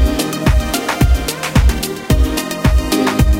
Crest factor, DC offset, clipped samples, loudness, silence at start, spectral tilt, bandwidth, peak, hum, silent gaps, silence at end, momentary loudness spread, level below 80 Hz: 14 dB; under 0.1%; under 0.1%; -15 LUFS; 0 s; -5 dB/octave; 17 kHz; 0 dBFS; none; none; 0 s; 3 LU; -16 dBFS